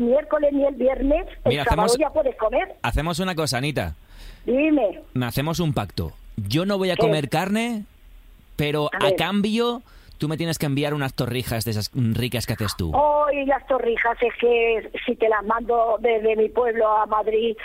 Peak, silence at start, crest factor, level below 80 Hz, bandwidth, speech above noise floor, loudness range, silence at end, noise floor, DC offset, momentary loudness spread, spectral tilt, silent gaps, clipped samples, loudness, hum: -6 dBFS; 0 s; 16 dB; -40 dBFS; 16 kHz; 25 dB; 3 LU; 0 s; -47 dBFS; under 0.1%; 7 LU; -5.5 dB/octave; none; under 0.1%; -22 LUFS; none